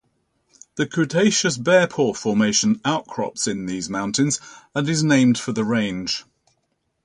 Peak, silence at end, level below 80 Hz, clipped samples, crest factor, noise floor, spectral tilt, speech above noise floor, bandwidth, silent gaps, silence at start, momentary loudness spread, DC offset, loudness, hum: -6 dBFS; 0.85 s; -58 dBFS; under 0.1%; 16 dB; -72 dBFS; -4 dB/octave; 51 dB; 11 kHz; none; 0.75 s; 10 LU; under 0.1%; -20 LUFS; none